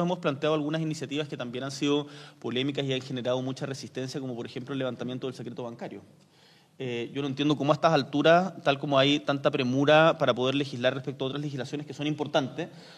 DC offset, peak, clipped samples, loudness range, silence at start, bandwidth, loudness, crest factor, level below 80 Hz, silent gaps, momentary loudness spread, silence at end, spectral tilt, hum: under 0.1%; -8 dBFS; under 0.1%; 12 LU; 0 s; 11.5 kHz; -28 LUFS; 20 dB; -72 dBFS; none; 14 LU; 0 s; -5.5 dB/octave; none